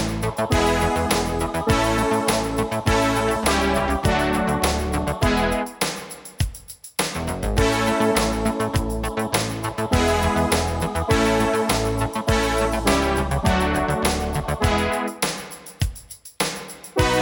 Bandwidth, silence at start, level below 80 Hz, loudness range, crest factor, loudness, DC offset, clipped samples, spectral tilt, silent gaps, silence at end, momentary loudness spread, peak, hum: 19.5 kHz; 0 s; -32 dBFS; 3 LU; 18 dB; -22 LUFS; under 0.1%; under 0.1%; -4.5 dB/octave; none; 0 s; 8 LU; -4 dBFS; none